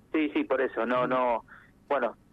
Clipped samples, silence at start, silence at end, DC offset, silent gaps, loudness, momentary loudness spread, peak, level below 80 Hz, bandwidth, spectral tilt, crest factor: under 0.1%; 0.15 s; 0.2 s; under 0.1%; none; -28 LUFS; 4 LU; -16 dBFS; -64 dBFS; 5.4 kHz; -7.5 dB/octave; 14 dB